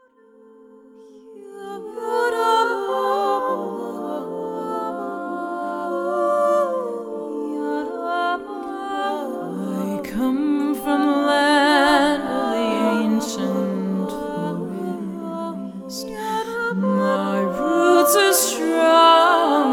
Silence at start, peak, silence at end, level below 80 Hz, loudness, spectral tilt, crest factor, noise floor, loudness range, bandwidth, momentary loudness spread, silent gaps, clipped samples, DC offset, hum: 0.95 s; -2 dBFS; 0 s; -58 dBFS; -20 LUFS; -4 dB/octave; 18 dB; -51 dBFS; 7 LU; 18 kHz; 14 LU; none; under 0.1%; under 0.1%; none